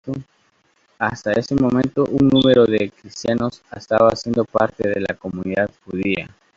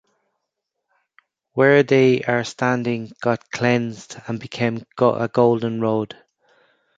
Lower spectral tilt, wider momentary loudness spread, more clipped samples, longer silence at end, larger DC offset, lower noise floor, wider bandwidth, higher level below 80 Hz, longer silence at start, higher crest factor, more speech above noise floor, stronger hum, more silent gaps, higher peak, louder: about the same, -6.5 dB/octave vs -6.5 dB/octave; second, 12 LU vs 15 LU; neither; second, 0.3 s vs 0.9 s; neither; second, -61 dBFS vs -79 dBFS; about the same, 7.6 kHz vs 7.8 kHz; first, -50 dBFS vs -62 dBFS; second, 0.05 s vs 1.55 s; about the same, 18 dB vs 18 dB; second, 42 dB vs 60 dB; neither; neither; about the same, -2 dBFS vs -2 dBFS; about the same, -19 LUFS vs -20 LUFS